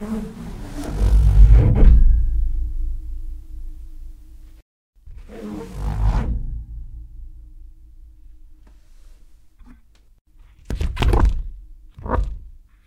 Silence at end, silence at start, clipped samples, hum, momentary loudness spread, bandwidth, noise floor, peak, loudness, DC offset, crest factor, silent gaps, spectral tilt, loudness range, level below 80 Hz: 0.35 s; 0 s; under 0.1%; none; 26 LU; 6.2 kHz; -49 dBFS; 0 dBFS; -21 LUFS; under 0.1%; 20 dB; 4.62-4.93 s, 10.21-10.25 s; -8 dB/octave; 18 LU; -20 dBFS